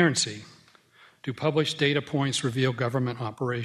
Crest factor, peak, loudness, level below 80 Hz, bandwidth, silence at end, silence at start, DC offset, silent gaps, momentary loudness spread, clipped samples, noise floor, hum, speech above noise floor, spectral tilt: 20 dB; -8 dBFS; -27 LUFS; -66 dBFS; 13 kHz; 0 s; 0 s; under 0.1%; none; 9 LU; under 0.1%; -57 dBFS; none; 31 dB; -4.5 dB/octave